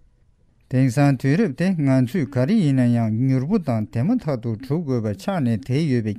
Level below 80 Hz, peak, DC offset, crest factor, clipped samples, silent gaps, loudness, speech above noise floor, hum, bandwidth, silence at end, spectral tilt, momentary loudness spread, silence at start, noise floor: -52 dBFS; -4 dBFS; under 0.1%; 16 dB; under 0.1%; none; -21 LUFS; 38 dB; none; 13.5 kHz; 0 s; -8 dB/octave; 7 LU; 0.7 s; -58 dBFS